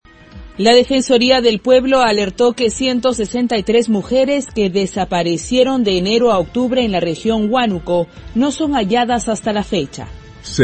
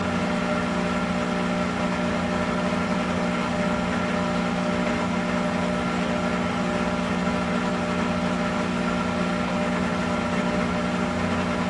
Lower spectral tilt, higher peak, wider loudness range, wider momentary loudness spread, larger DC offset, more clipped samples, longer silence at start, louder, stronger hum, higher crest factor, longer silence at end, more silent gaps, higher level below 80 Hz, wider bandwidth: second, -4.5 dB/octave vs -6 dB/octave; first, 0 dBFS vs -12 dBFS; first, 3 LU vs 0 LU; first, 7 LU vs 1 LU; neither; neither; first, 0.35 s vs 0 s; first, -15 LUFS vs -25 LUFS; second, none vs 60 Hz at -30 dBFS; about the same, 16 dB vs 14 dB; about the same, 0 s vs 0 s; neither; first, -40 dBFS vs -46 dBFS; second, 8.8 kHz vs 11.5 kHz